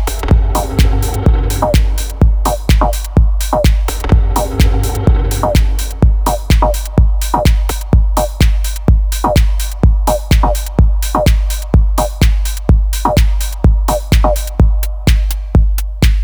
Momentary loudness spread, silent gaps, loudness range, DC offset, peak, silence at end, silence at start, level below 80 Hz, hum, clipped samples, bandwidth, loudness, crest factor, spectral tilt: 3 LU; none; 0 LU; under 0.1%; 0 dBFS; 0 s; 0 s; -12 dBFS; none; under 0.1%; over 20 kHz; -14 LUFS; 10 dB; -5.5 dB/octave